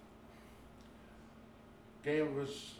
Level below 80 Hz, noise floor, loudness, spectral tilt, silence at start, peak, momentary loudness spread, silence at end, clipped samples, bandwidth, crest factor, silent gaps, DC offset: -66 dBFS; -58 dBFS; -38 LUFS; -5.5 dB/octave; 0 s; -24 dBFS; 23 LU; 0 s; under 0.1%; 15 kHz; 18 dB; none; under 0.1%